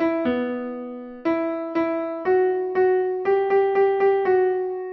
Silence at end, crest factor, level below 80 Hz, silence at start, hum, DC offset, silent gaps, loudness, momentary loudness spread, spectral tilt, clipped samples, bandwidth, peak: 0 s; 12 dB; -62 dBFS; 0 s; none; under 0.1%; none; -22 LUFS; 9 LU; -8 dB/octave; under 0.1%; 5.2 kHz; -10 dBFS